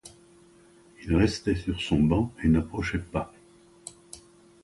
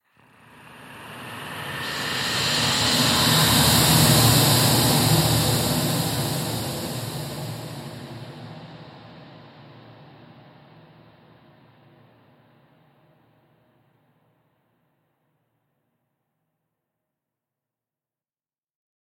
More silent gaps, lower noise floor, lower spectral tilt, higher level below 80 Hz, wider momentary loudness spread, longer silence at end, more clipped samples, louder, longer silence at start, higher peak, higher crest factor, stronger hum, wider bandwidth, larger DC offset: neither; second, -56 dBFS vs under -90 dBFS; first, -6.5 dB/octave vs -3.5 dB/octave; first, -40 dBFS vs -46 dBFS; second, 21 LU vs 24 LU; second, 0.45 s vs 9.15 s; neither; second, -26 LUFS vs -19 LUFS; second, 0.05 s vs 0.7 s; second, -10 dBFS vs -4 dBFS; about the same, 18 dB vs 22 dB; neither; second, 11.5 kHz vs 16.5 kHz; neither